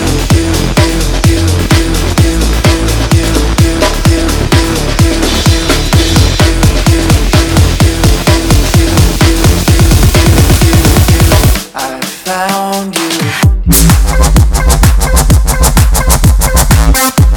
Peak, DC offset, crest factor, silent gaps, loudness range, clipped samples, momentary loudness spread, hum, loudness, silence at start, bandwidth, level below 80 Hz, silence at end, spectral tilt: 0 dBFS; under 0.1%; 8 dB; none; 2 LU; 0.6%; 5 LU; none; -9 LUFS; 0 s; over 20 kHz; -12 dBFS; 0 s; -4.5 dB/octave